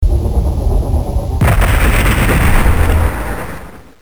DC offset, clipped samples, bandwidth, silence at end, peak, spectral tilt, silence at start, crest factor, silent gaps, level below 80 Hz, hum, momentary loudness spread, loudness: under 0.1%; under 0.1%; over 20 kHz; 0 s; 0 dBFS; -6 dB/octave; 0 s; 12 dB; none; -14 dBFS; none; 10 LU; -14 LUFS